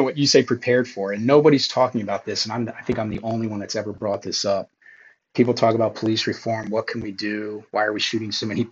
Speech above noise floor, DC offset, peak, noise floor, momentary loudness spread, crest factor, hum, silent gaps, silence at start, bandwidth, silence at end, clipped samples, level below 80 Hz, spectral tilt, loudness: 29 dB; under 0.1%; -2 dBFS; -51 dBFS; 10 LU; 20 dB; none; none; 0 s; 8 kHz; 0 s; under 0.1%; -58 dBFS; -4.5 dB/octave; -22 LUFS